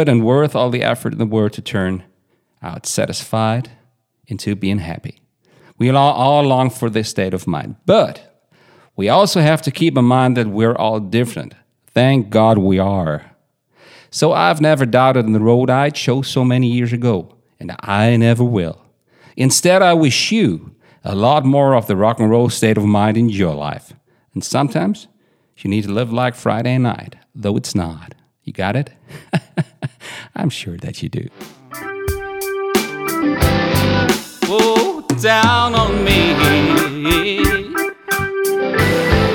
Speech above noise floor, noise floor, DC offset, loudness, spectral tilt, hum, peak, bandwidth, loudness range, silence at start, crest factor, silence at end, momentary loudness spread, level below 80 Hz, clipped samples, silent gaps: 47 dB; -62 dBFS; under 0.1%; -16 LUFS; -5.5 dB/octave; none; 0 dBFS; 19 kHz; 8 LU; 0 s; 16 dB; 0 s; 15 LU; -36 dBFS; under 0.1%; none